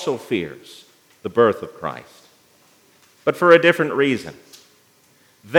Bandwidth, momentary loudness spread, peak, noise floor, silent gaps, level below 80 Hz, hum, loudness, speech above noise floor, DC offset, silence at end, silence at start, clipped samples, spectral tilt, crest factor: 16.5 kHz; 21 LU; 0 dBFS; -56 dBFS; none; -68 dBFS; none; -18 LUFS; 37 dB; under 0.1%; 0 s; 0 s; under 0.1%; -5.5 dB/octave; 20 dB